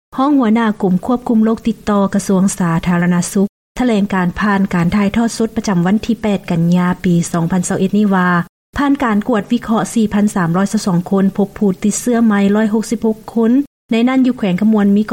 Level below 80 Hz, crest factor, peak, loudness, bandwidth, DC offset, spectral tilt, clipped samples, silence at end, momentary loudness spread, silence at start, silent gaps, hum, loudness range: -40 dBFS; 10 dB; -4 dBFS; -15 LUFS; 16 kHz; 0.2%; -6.5 dB/octave; under 0.1%; 0 s; 4 LU; 0.1 s; 3.49-3.75 s, 8.49-8.73 s, 13.67-13.89 s; none; 1 LU